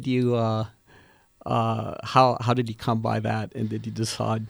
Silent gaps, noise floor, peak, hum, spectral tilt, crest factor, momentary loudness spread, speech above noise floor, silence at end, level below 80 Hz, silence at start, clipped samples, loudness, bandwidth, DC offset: none; -56 dBFS; -4 dBFS; none; -6.5 dB/octave; 22 dB; 10 LU; 31 dB; 0 s; -58 dBFS; 0 s; under 0.1%; -25 LUFS; over 20 kHz; under 0.1%